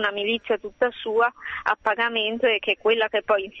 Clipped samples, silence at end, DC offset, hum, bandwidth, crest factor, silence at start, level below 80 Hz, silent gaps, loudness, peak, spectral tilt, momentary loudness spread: under 0.1%; 0 s; under 0.1%; none; 6 kHz; 18 dB; 0 s; -62 dBFS; none; -23 LUFS; -6 dBFS; -4.5 dB/octave; 4 LU